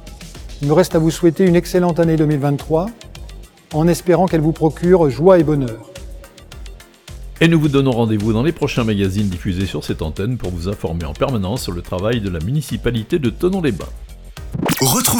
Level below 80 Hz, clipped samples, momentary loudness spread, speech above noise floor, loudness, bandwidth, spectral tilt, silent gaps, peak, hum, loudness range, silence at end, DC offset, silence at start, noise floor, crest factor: -34 dBFS; under 0.1%; 22 LU; 20 dB; -17 LUFS; over 20 kHz; -6 dB/octave; none; 0 dBFS; none; 5 LU; 0 s; under 0.1%; 0 s; -36 dBFS; 16 dB